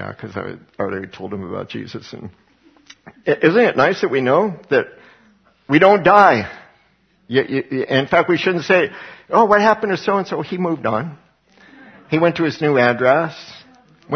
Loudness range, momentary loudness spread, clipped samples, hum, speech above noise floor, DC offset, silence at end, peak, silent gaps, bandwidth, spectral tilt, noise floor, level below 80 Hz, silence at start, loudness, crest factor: 5 LU; 18 LU; under 0.1%; none; 41 dB; under 0.1%; 0 s; 0 dBFS; none; 6.6 kHz; -6.5 dB/octave; -58 dBFS; -58 dBFS; 0 s; -16 LUFS; 18 dB